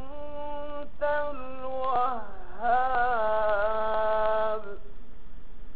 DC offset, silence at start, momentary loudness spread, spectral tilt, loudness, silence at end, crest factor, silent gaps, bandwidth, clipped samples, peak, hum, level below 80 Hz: 4%; 0 s; 13 LU; -2.5 dB/octave; -29 LUFS; 0 s; 16 dB; none; 4.8 kHz; under 0.1%; -12 dBFS; none; -44 dBFS